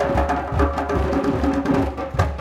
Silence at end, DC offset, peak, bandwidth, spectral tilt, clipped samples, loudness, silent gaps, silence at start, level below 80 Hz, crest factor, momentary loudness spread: 0 s; under 0.1%; -4 dBFS; 12.5 kHz; -7.5 dB/octave; under 0.1%; -21 LUFS; none; 0 s; -28 dBFS; 16 dB; 3 LU